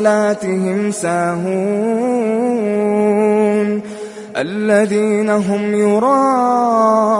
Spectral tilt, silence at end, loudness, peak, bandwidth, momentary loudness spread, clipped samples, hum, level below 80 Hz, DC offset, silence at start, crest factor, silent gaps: -6.5 dB/octave; 0 s; -15 LUFS; -2 dBFS; 11.5 kHz; 6 LU; under 0.1%; none; -62 dBFS; under 0.1%; 0 s; 14 dB; none